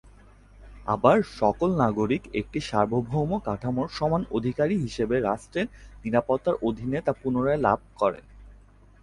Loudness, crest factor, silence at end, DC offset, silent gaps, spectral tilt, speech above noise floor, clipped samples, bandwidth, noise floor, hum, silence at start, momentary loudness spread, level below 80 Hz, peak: -26 LUFS; 22 dB; 0.5 s; under 0.1%; none; -7.5 dB/octave; 27 dB; under 0.1%; 11.5 kHz; -52 dBFS; none; 0.6 s; 7 LU; -48 dBFS; -4 dBFS